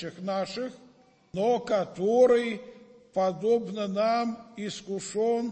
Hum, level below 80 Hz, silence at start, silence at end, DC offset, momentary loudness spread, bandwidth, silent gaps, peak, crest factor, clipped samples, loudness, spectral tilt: none; -68 dBFS; 0 s; 0 s; under 0.1%; 14 LU; 8.8 kHz; none; -10 dBFS; 18 dB; under 0.1%; -28 LUFS; -5.5 dB/octave